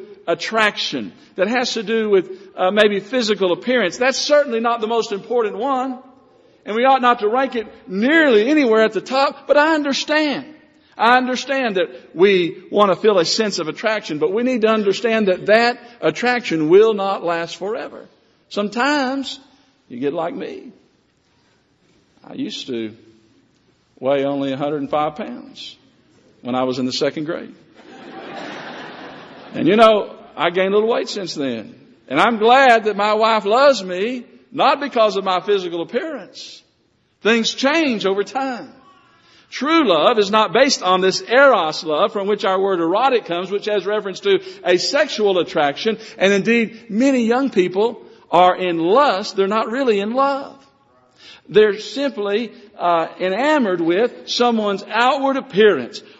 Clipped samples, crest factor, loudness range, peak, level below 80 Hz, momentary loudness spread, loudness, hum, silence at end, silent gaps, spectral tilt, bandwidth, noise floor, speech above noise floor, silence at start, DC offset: under 0.1%; 18 dB; 9 LU; 0 dBFS; -66 dBFS; 15 LU; -17 LUFS; none; 0.2 s; none; -2.5 dB/octave; 8 kHz; -62 dBFS; 45 dB; 0 s; under 0.1%